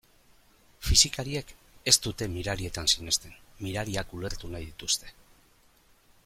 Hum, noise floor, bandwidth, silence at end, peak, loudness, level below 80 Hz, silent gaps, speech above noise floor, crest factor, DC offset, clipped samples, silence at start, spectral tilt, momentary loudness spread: none; -62 dBFS; 16.5 kHz; 1.15 s; -4 dBFS; -27 LUFS; -42 dBFS; none; 32 dB; 26 dB; under 0.1%; under 0.1%; 0.8 s; -2 dB/octave; 16 LU